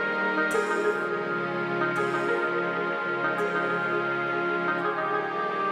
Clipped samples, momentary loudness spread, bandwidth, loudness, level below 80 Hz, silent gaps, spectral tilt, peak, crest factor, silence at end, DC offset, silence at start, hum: under 0.1%; 3 LU; 15 kHz; -27 LUFS; -78 dBFS; none; -5.5 dB/octave; -14 dBFS; 14 dB; 0 s; under 0.1%; 0 s; none